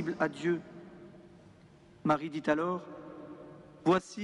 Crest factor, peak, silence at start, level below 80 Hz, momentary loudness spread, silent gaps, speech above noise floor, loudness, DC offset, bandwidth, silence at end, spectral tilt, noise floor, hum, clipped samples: 20 dB; -14 dBFS; 0 s; -70 dBFS; 22 LU; none; 27 dB; -32 LUFS; under 0.1%; 11 kHz; 0 s; -6.5 dB/octave; -58 dBFS; none; under 0.1%